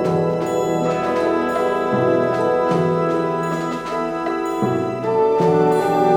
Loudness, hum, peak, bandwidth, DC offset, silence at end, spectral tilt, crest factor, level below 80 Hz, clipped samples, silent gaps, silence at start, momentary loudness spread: -19 LUFS; none; -4 dBFS; 17.5 kHz; under 0.1%; 0 s; -7 dB/octave; 14 dB; -52 dBFS; under 0.1%; none; 0 s; 6 LU